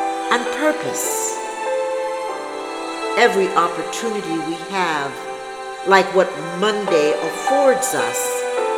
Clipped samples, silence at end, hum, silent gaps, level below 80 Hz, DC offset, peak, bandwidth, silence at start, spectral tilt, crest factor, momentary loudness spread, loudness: under 0.1%; 0 s; none; none; -62 dBFS; under 0.1%; 0 dBFS; over 20 kHz; 0 s; -3 dB/octave; 20 dB; 11 LU; -19 LUFS